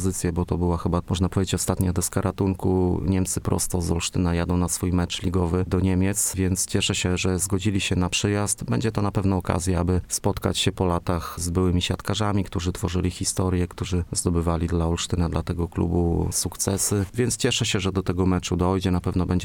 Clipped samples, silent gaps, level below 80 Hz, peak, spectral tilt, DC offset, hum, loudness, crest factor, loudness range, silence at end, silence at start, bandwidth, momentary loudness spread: under 0.1%; none; -38 dBFS; -6 dBFS; -5 dB/octave; under 0.1%; none; -24 LUFS; 18 dB; 2 LU; 0 s; 0 s; 18 kHz; 3 LU